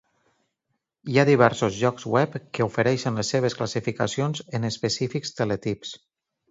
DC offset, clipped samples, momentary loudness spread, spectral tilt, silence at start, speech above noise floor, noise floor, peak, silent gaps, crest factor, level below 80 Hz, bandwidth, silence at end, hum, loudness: under 0.1%; under 0.1%; 10 LU; -5.5 dB/octave; 1.05 s; 55 dB; -79 dBFS; -2 dBFS; none; 22 dB; -60 dBFS; 8 kHz; 0.55 s; none; -24 LUFS